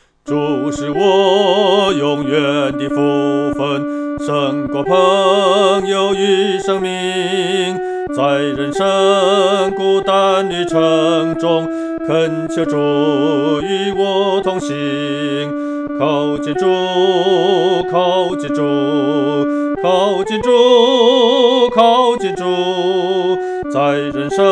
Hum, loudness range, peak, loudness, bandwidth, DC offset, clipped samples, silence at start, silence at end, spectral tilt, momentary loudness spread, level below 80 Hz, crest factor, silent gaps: none; 4 LU; 0 dBFS; -14 LUFS; 10.5 kHz; under 0.1%; under 0.1%; 0.25 s; 0 s; -5 dB/octave; 8 LU; -50 dBFS; 14 dB; none